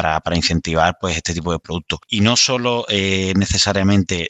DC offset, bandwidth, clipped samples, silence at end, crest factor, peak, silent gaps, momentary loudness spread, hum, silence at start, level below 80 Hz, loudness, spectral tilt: under 0.1%; 8.8 kHz; under 0.1%; 0 s; 16 dB; -2 dBFS; none; 9 LU; none; 0 s; -36 dBFS; -17 LUFS; -4 dB/octave